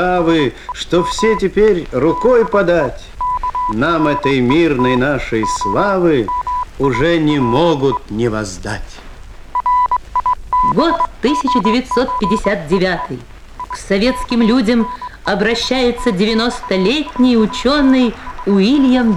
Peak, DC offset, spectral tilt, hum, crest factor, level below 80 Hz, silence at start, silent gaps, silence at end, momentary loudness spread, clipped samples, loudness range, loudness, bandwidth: 0 dBFS; under 0.1%; -5.5 dB/octave; none; 14 dB; -34 dBFS; 0 s; none; 0 s; 9 LU; under 0.1%; 3 LU; -15 LUFS; 12.5 kHz